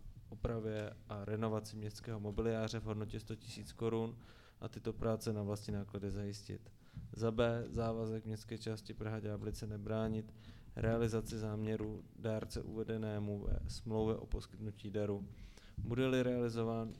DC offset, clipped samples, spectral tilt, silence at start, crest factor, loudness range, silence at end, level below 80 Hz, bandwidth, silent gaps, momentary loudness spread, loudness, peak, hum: under 0.1%; under 0.1%; -7 dB/octave; 0 s; 20 dB; 2 LU; 0 s; -52 dBFS; 14.5 kHz; none; 12 LU; -41 LUFS; -22 dBFS; none